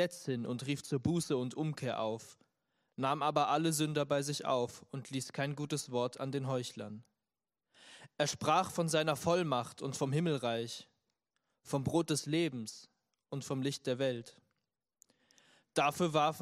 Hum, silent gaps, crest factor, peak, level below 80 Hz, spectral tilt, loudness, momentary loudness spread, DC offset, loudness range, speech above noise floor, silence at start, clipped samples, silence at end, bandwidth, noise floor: none; none; 20 dB; -16 dBFS; -74 dBFS; -5 dB/octave; -35 LUFS; 13 LU; under 0.1%; 5 LU; over 55 dB; 0 s; under 0.1%; 0 s; 15.5 kHz; under -90 dBFS